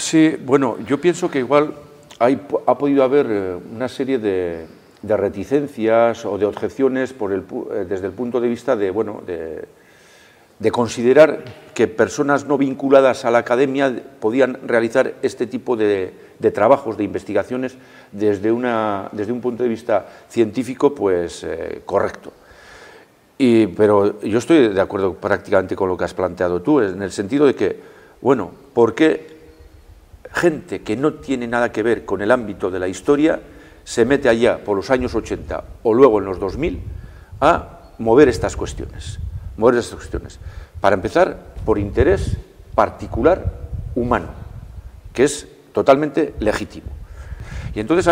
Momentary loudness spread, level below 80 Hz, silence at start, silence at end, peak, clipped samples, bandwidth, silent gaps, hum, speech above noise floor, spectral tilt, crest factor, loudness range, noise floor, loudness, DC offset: 14 LU; -38 dBFS; 0 s; 0 s; 0 dBFS; under 0.1%; 15 kHz; none; none; 31 dB; -6 dB/octave; 18 dB; 4 LU; -49 dBFS; -18 LUFS; under 0.1%